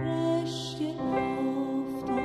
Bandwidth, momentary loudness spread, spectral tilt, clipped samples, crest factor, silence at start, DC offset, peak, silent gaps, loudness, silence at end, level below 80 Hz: 14 kHz; 5 LU; -6 dB/octave; under 0.1%; 12 dB; 0 s; under 0.1%; -16 dBFS; none; -30 LUFS; 0 s; -58 dBFS